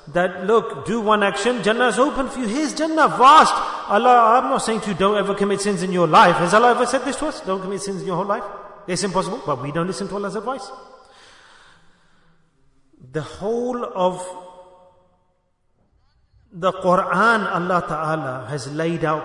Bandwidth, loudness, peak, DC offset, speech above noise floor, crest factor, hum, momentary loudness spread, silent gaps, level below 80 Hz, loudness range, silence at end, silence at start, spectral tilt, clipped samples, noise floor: 11 kHz; -19 LUFS; -2 dBFS; under 0.1%; 46 dB; 18 dB; none; 14 LU; none; -52 dBFS; 13 LU; 0 s; 0.05 s; -4.5 dB/octave; under 0.1%; -65 dBFS